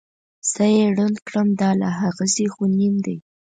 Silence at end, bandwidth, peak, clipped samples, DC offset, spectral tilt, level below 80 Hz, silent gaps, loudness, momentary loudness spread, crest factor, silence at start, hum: 0.4 s; 9.6 kHz; -8 dBFS; under 0.1%; under 0.1%; -5 dB/octave; -64 dBFS; 1.22-1.26 s; -20 LUFS; 8 LU; 14 dB; 0.45 s; none